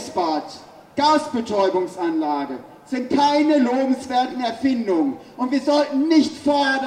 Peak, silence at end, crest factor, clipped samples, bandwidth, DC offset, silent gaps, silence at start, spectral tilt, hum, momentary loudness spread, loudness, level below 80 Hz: -4 dBFS; 0 s; 16 dB; under 0.1%; 11.5 kHz; under 0.1%; none; 0 s; -4.5 dB/octave; none; 11 LU; -20 LUFS; -64 dBFS